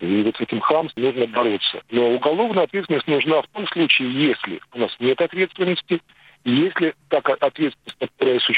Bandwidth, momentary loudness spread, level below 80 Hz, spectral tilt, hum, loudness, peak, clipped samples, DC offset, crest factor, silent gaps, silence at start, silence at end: 8.8 kHz; 8 LU; -68 dBFS; -7 dB/octave; none; -21 LUFS; -2 dBFS; under 0.1%; under 0.1%; 18 dB; none; 0 s; 0 s